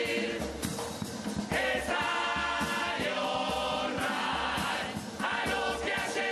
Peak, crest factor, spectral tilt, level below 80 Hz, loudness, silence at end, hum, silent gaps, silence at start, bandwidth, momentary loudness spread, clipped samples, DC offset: -16 dBFS; 16 dB; -3.5 dB/octave; -52 dBFS; -31 LUFS; 0 s; none; none; 0 s; 13 kHz; 6 LU; under 0.1%; under 0.1%